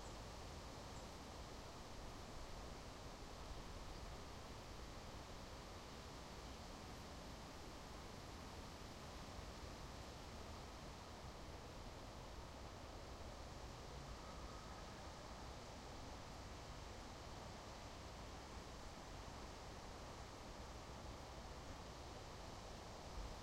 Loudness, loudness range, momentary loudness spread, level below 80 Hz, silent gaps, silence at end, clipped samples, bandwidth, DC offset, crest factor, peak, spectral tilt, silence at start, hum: -55 LUFS; 0 LU; 1 LU; -60 dBFS; none; 0 s; under 0.1%; 16 kHz; under 0.1%; 14 dB; -40 dBFS; -4.5 dB/octave; 0 s; none